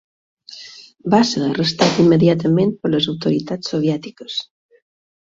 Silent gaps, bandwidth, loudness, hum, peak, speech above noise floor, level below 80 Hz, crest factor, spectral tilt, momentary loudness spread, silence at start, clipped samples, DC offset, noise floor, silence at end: none; 7.8 kHz; -17 LUFS; none; -2 dBFS; 23 dB; -56 dBFS; 16 dB; -6 dB/octave; 21 LU; 0.5 s; under 0.1%; under 0.1%; -39 dBFS; 0.9 s